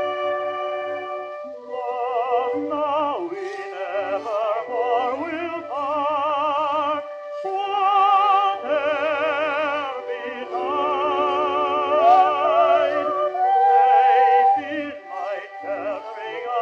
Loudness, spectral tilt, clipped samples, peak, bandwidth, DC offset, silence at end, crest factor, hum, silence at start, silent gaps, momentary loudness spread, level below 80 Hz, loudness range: -21 LUFS; -4.5 dB/octave; under 0.1%; -4 dBFS; 7 kHz; under 0.1%; 0 s; 16 dB; none; 0 s; none; 14 LU; -72 dBFS; 8 LU